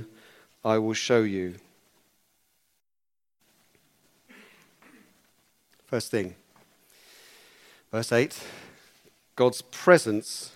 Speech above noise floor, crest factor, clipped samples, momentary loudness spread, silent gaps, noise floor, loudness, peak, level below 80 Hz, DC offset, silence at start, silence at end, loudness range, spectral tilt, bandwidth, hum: over 65 dB; 28 dB; under 0.1%; 20 LU; none; under -90 dBFS; -26 LUFS; -2 dBFS; -74 dBFS; under 0.1%; 0 s; 0.05 s; 11 LU; -4.5 dB/octave; 16 kHz; none